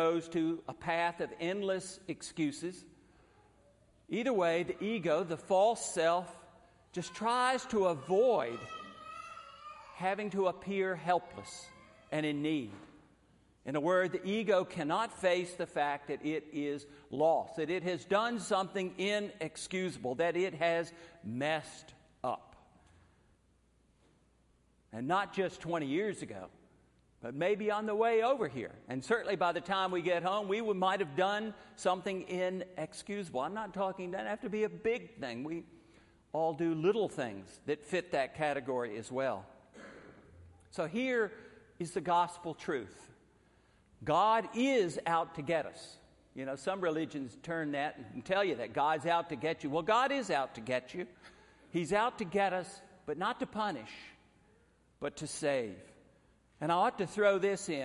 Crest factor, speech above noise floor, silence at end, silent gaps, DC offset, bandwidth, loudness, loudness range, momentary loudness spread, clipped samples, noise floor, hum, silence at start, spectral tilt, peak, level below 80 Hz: 18 dB; 36 dB; 0 s; none; under 0.1%; 11.5 kHz; -34 LUFS; 5 LU; 15 LU; under 0.1%; -70 dBFS; none; 0 s; -5 dB/octave; -16 dBFS; -70 dBFS